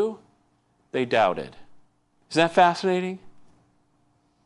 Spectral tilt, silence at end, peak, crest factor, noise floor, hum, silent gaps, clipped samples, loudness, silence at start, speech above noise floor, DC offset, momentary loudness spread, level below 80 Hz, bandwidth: -5 dB/octave; 1.05 s; -4 dBFS; 22 dB; -66 dBFS; none; none; under 0.1%; -23 LUFS; 0 s; 44 dB; under 0.1%; 21 LU; -68 dBFS; 11.5 kHz